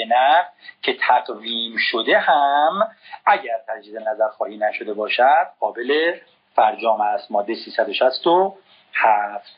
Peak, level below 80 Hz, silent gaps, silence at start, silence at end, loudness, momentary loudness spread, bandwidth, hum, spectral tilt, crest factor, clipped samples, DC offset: -2 dBFS; -86 dBFS; none; 0 s; 0.2 s; -19 LUFS; 10 LU; 5.4 kHz; none; 0.5 dB/octave; 18 dB; under 0.1%; under 0.1%